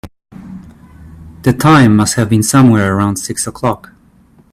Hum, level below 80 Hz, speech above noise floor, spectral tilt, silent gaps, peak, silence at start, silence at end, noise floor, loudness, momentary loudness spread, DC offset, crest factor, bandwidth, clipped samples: none; -42 dBFS; 36 dB; -5.5 dB/octave; none; 0 dBFS; 0.05 s; 0.75 s; -47 dBFS; -11 LUFS; 18 LU; under 0.1%; 12 dB; 15.5 kHz; under 0.1%